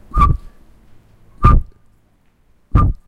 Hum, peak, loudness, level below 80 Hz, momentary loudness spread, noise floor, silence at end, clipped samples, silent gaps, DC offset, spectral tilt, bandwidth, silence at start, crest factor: none; 0 dBFS; -16 LUFS; -20 dBFS; 5 LU; -55 dBFS; 0.15 s; under 0.1%; none; under 0.1%; -9 dB/octave; 5 kHz; 0.15 s; 16 dB